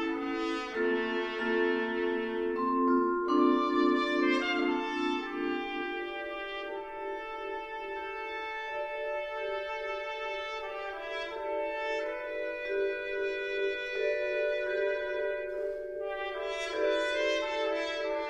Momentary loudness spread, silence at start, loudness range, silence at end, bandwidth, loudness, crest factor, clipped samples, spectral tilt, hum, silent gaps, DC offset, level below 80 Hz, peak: 10 LU; 0 s; 8 LU; 0 s; 9.6 kHz; -32 LUFS; 18 dB; under 0.1%; -3.5 dB/octave; none; none; under 0.1%; -62 dBFS; -14 dBFS